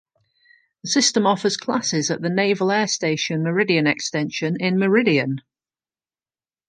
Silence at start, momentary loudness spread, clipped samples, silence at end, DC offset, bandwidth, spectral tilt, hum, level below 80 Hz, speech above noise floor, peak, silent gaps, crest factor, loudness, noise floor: 0.85 s; 6 LU; under 0.1%; 1.3 s; under 0.1%; 10.5 kHz; -4 dB/octave; none; -68 dBFS; over 70 dB; -4 dBFS; none; 18 dB; -20 LUFS; under -90 dBFS